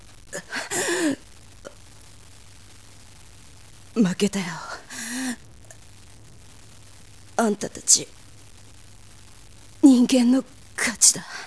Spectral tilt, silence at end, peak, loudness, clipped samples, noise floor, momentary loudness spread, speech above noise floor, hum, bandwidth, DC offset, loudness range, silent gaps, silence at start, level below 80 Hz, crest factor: -2.5 dB/octave; 0 s; -2 dBFS; -21 LUFS; under 0.1%; -48 dBFS; 19 LU; 27 dB; none; 11 kHz; 0.4%; 10 LU; none; 0.3 s; -56 dBFS; 24 dB